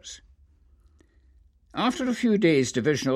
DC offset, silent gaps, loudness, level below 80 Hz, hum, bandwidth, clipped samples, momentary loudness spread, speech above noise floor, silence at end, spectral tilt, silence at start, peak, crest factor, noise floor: under 0.1%; none; -24 LUFS; -58 dBFS; none; 13.5 kHz; under 0.1%; 19 LU; 36 dB; 0 s; -5 dB/octave; 0.05 s; -8 dBFS; 18 dB; -59 dBFS